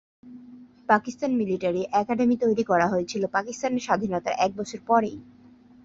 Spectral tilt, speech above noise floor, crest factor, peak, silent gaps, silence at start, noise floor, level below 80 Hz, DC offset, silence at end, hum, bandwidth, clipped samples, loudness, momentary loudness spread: -5.5 dB/octave; 24 dB; 22 dB; -4 dBFS; none; 0.25 s; -48 dBFS; -62 dBFS; under 0.1%; 0.6 s; none; 7.8 kHz; under 0.1%; -25 LUFS; 6 LU